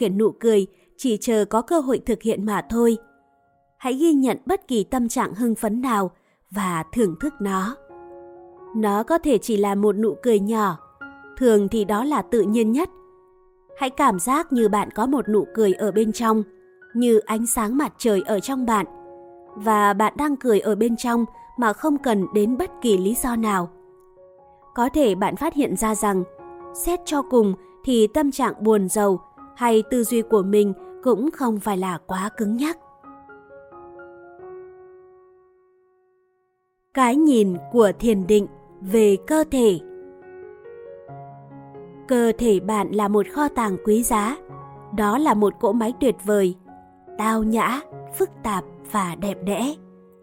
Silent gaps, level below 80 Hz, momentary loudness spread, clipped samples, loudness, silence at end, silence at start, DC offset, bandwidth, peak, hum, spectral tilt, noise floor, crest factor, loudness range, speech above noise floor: none; -50 dBFS; 16 LU; under 0.1%; -21 LUFS; 0.45 s; 0 s; under 0.1%; 17 kHz; -4 dBFS; none; -5.5 dB/octave; -70 dBFS; 18 dB; 4 LU; 50 dB